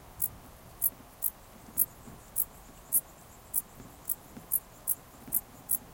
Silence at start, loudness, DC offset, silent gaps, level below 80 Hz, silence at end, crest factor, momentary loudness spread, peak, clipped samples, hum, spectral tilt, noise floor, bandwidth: 0 s; -32 LUFS; under 0.1%; none; -58 dBFS; 0 s; 26 dB; 22 LU; -10 dBFS; under 0.1%; none; -2 dB/octave; -52 dBFS; 17.5 kHz